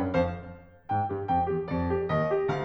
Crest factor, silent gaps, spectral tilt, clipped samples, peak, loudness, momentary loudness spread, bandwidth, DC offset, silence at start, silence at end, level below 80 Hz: 14 dB; none; -8.5 dB/octave; under 0.1%; -14 dBFS; -29 LUFS; 12 LU; 6.8 kHz; under 0.1%; 0 s; 0 s; -50 dBFS